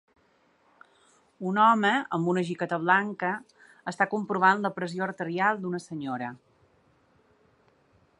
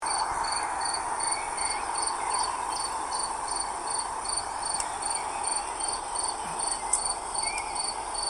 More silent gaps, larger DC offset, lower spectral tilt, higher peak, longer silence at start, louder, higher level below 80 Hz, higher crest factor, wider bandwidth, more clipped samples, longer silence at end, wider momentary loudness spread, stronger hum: neither; neither; first, -6 dB/octave vs 0 dB/octave; about the same, -8 dBFS vs -10 dBFS; first, 1.4 s vs 0 s; first, -26 LUFS vs -29 LUFS; second, -76 dBFS vs -54 dBFS; about the same, 22 dB vs 22 dB; second, 11 kHz vs 14 kHz; neither; first, 1.85 s vs 0 s; first, 13 LU vs 3 LU; neither